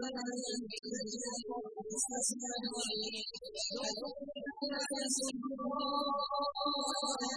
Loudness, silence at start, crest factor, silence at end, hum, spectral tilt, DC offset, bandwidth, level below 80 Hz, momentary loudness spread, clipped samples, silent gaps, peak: -37 LUFS; 0 s; 18 dB; 0 s; none; -1.5 dB/octave; under 0.1%; 11 kHz; -72 dBFS; 7 LU; under 0.1%; none; -20 dBFS